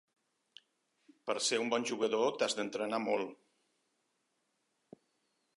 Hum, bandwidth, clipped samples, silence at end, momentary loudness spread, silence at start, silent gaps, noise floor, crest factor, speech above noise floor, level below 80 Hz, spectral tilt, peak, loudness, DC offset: none; 11.5 kHz; under 0.1%; 2.25 s; 7 LU; 1.25 s; none; -81 dBFS; 20 dB; 47 dB; under -90 dBFS; -2.5 dB/octave; -18 dBFS; -34 LUFS; under 0.1%